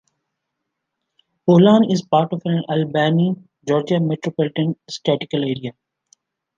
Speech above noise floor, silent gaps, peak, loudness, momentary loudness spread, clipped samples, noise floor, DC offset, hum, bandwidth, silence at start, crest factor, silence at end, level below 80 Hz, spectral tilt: 61 dB; none; -2 dBFS; -19 LUFS; 11 LU; under 0.1%; -78 dBFS; under 0.1%; none; 7.6 kHz; 1.45 s; 18 dB; 0.85 s; -64 dBFS; -7.5 dB/octave